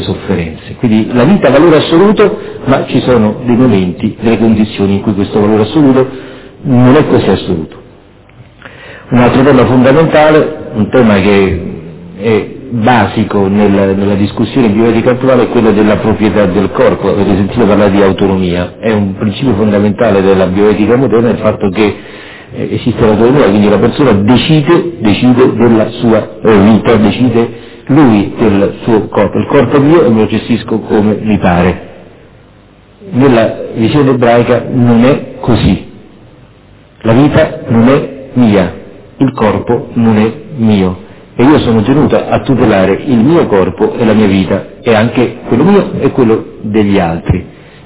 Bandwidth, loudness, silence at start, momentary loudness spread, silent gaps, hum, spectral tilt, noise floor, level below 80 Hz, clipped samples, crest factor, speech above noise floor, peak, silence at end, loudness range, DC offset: 4 kHz; -9 LUFS; 0 s; 8 LU; none; none; -11.5 dB/octave; -39 dBFS; -32 dBFS; 1%; 8 dB; 32 dB; 0 dBFS; 0.35 s; 3 LU; under 0.1%